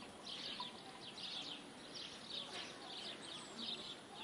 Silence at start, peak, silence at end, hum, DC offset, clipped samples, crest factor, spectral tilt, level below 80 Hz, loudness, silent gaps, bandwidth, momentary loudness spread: 0 s; -34 dBFS; 0 s; none; under 0.1%; under 0.1%; 16 dB; -2 dB/octave; -82 dBFS; -47 LUFS; none; 11.5 kHz; 5 LU